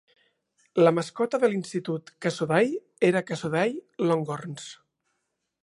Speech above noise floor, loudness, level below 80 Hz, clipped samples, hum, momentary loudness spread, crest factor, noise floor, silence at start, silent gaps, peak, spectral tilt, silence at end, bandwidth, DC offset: 54 dB; -26 LUFS; -74 dBFS; under 0.1%; none; 12 LU; 20 dB; -79 dBFS; 0.75 s; none; -6 dBFS; -6 dB/octave; 0.9 s; 11.5 kHz; under 0.1%